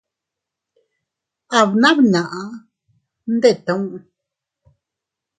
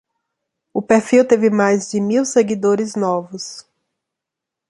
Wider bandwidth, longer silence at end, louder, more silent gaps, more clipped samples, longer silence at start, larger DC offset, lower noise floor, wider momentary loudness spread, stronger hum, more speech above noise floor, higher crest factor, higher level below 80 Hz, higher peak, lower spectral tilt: second, 9.4 kHz vs 11.5 kHz; first, 1.4 s vs 1.1 s; about the same, -16 LUFS vs -16 LUFS; neither; neither; first, 1.5 s vs 0.75 s; neither; about the same, -84 dBFS vs -83 dBFS; first, 21 LU vs 16 LU; neither; about the same, 68 dB vs 68 dB; about the same, 20 dB vs 16 dB; about the same, -66 dBFS vs -62 dBFS; about the same, 0 dBFS vs -2 dBFS; about the same, -5 dB/octave vs -5 dB/octave